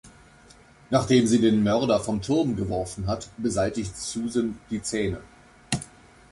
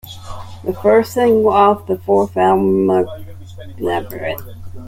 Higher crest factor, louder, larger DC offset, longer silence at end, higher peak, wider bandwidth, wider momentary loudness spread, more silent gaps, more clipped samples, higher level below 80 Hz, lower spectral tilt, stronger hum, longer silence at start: about the same, 18 dB vs 14 dB; second, -25 LUFS vs -15 LUFS; neither; first, 0.45 s vs 0 s; second, -8 dBFS vs -2 dBFS; second, 11.5 kHz vs 16.5 kHz; second, 11 LU vs 21 LU; neither; neither; about the same, -48 dBFS vs -44 dBFS; about the same, -5.5 dB/octave vs -6.5 dB/octave; neither; about the same, 0.05 s vs 0.05 s